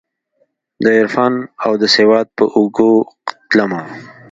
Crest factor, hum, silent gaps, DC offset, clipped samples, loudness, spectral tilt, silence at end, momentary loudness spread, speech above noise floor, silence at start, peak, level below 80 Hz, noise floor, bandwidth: 14 dB; none; none; under 0.1%; under 0.1%; -14 LUFS; -5 dB/octave; 0.2 s; 14 LU; 49 dB; 0.8 s; 0 dBFS; -60 dBFS; -63 dBFS; 7.8 kHz